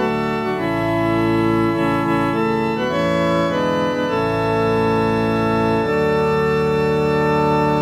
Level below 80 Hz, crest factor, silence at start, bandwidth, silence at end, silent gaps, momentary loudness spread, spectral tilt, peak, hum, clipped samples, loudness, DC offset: -42 dBFS; 14 dB; 0 s; 16 kHz; 0 s; none; 3 LU; -7 dB/octave; -4 dBFS; none; under 0.1%; -18 LUFS; under 0.1%